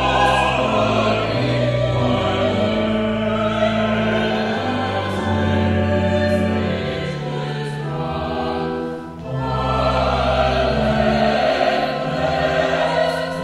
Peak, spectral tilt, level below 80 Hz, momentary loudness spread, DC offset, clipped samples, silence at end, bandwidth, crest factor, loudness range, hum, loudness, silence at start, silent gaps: -4 dBFS; -6.5 dB/octave; -34 dBFS; 7 LU; under 0.1%; under 0.1%; 0 s; 12.5 kHz; 14 dB; 4 LU; none; -19 LUFS; 0 s; none